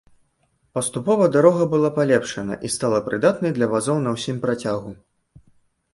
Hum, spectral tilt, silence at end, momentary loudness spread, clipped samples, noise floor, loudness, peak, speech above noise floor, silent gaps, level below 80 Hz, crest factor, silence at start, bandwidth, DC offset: none; -5.5 dB/octave; 1 s; 12 LU; under 0.1%; -66 dBFS; -21 LUFS; -2 dBFS; 46 dB; none; -58 dBFS; 20 dB; 0.75 s; 11.5 kHz; under 0.1%